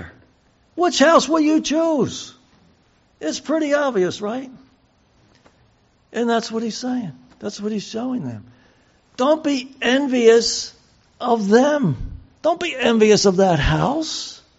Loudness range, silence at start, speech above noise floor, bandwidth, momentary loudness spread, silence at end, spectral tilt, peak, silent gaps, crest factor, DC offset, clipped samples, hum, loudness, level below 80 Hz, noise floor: 8 LU; 0 s; 40 dB; 8 kHz; 17 LU; 0.25 s; -4 dB/octave; -2 dBFS; none; 18 dB; under 0.1%; under 0.1%; none; -19 LUFS; -42 dBFS; -58 dBFS